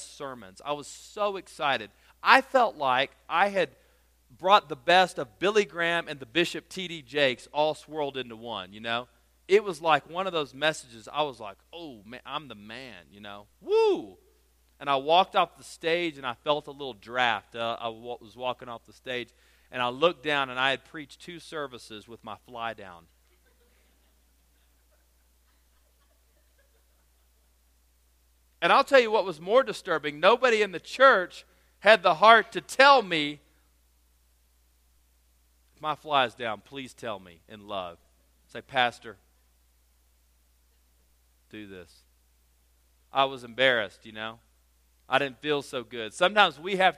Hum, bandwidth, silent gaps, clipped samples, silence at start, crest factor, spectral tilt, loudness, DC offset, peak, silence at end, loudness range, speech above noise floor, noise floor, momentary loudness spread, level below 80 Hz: none; 15 kHz; none; under 0.1%; 0 s; 28 dB; -3.5 dB/octave; -26 LUFS; under 0.1%; 0 dBFS; 0.05 s; 13 LU; 38 dB; -65 dBFS; 23 LU; -66 dBFS